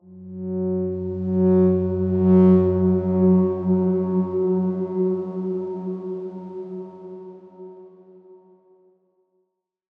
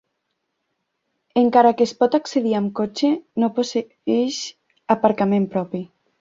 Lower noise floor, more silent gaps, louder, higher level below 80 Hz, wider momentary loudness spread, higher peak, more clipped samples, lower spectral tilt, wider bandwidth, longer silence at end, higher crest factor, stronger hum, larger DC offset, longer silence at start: about the same, -74 dBFS vs -75 dBFS; neither; about the same, -21 LUFS vs -20 LUFS; second, -70 dBFS vs -64 dBFS; first, 22 LU vs 14 LU; second, -6 dBFS vs -2 dBFS; neither; first, -13 dB/octave vs -5.5 dB/octave; second, 2.4 kHz vs 7.8 kHz; first, 1.65 s vs 0.35 s; about the same, 16 dB vs 18 dB; neither; neither; second, 0.1 s vs 1.35 s